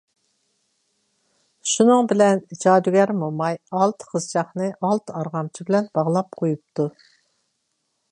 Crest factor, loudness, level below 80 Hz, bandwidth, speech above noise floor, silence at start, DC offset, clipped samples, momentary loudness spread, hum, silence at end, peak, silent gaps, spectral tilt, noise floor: 20 dB; -21 LUFS; -74 dBFS; 11 kHz; 53 dB; 1.65 s; under 0.1%; under 0.1%; 12 LU; none; 1.25 s; -2 dBFS; none; -5.5 dB/octave; -73 dBFS